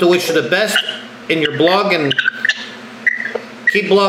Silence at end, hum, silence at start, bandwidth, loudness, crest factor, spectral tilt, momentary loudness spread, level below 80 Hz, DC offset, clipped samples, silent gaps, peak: 0 s; none; 0 s; 16 kHz; -15 LUFS; 14 dB; -4 dB/octave; 11 LU; -62 dBFS; under 0.1%; under 0.1%; none; -2 dBFS